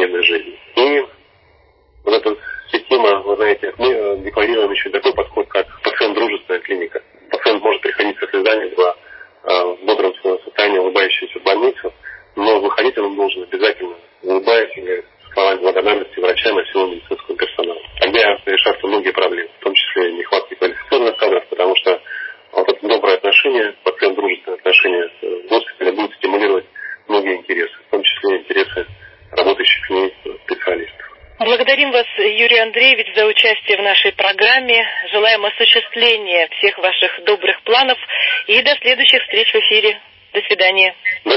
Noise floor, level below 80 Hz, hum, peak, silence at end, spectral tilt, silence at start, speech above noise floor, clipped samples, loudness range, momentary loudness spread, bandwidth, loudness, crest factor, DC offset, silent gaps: -52 dBFS; -52 dBFS; none; 0 dBFS; 0 s; -4.5 dB/octave; 0 s; 38 dB; under 0.1%; 6 LU; 11 LU; 5.8 kHz; -14 LUFS; 16 dB; under 0.1%; none